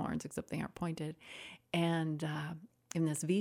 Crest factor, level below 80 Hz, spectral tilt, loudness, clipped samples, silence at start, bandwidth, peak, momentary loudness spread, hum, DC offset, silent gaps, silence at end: 18 dB; -68 dBFS; -5.5 dB/octave; -38 LUFS; under 0.1%; 0 s; 16 kHz; -18 dBFS; 15 LU; none; under 0.1%; none; 0 s